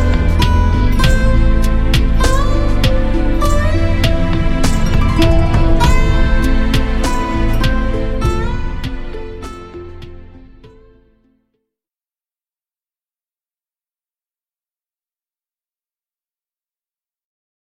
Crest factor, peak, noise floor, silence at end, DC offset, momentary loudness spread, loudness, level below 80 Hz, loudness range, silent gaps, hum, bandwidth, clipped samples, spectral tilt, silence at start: 14 dB; 0 dBFS; under -90 dBFS; 6.95 s; under 0.1%; 15 LU; -15 LUFS; -16 dBFS; 14 LU; none; none; 14 kHz; under 0.1%; -6 dB/octave; 0 s